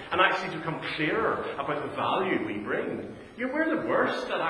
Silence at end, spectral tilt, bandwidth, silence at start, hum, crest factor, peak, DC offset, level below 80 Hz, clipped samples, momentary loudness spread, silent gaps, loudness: 0 s; -5.5 dB/octave; 11 kHz; 0 s; none; 24 dB; -6 dBFS; under 0.1%; -62 dBFS; under 0.1%; 8 LU; none; -28 LUFS